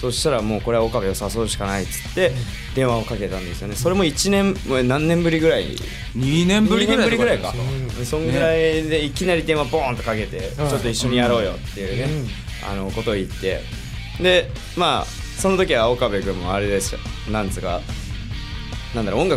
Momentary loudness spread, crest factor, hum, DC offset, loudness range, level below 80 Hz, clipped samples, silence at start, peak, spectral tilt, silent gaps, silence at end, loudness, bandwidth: 12 LU; 14 dB; none; under 0.1%; 4 LU; -32 dBFS; under 0.1%; 0 s; -6 dBFS; -5 dB/octave; none; 0 s; -21 LUFS; 16 kHz